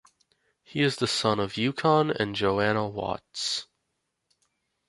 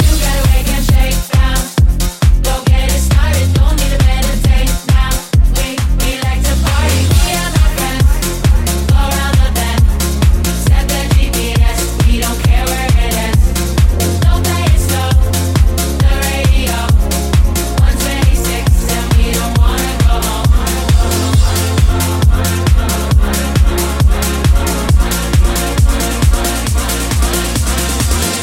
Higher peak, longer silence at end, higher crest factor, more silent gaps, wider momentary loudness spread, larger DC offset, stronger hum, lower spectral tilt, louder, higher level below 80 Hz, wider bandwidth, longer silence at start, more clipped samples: second, -8 dBFS vs 0 dBFS; first, 1.25 s vs 0 s; first, 20 dB vs 10 dB; neither; first, 9 LU vs 2 LU; neither; neither; about the same, -4.5 dB/octave vs -4.5 dB/octave; second, -26 LUFS vs -13 LUFS; second, -60 dBFS vs -12 dBFS; second, 11.5 kHz vs 17 kHz; first, 0.7 s vs 0 s; neither